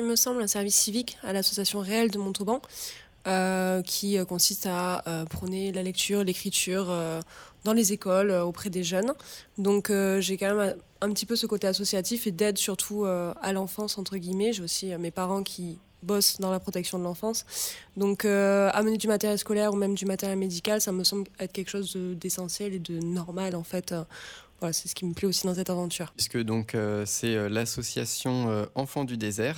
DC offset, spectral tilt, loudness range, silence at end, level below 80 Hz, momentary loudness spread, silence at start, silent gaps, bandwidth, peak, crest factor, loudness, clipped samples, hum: under 0.1%; -3.5 dB/octave; 4 LU; 0 s; -60 dBFS; 9 LU; 0 s; none; over 20 kHz; -8 dBFS; 20 dB; -28 LUFS; under 0.1%; none